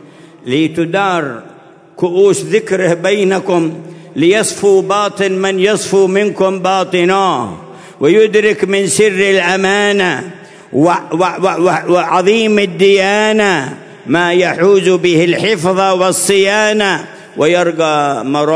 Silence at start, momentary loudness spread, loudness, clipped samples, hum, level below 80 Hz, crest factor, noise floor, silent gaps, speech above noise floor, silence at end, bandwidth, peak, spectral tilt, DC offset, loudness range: 0.45 s; 8 LU; -12 LUFS; under 0.1%; none; -58 dBFS; 12 dB; -36 dBFS; none; 25 dB; 0 s; 11 kHz; 0 dBFS; -4 dB/octave; under 0.1%; 2 LU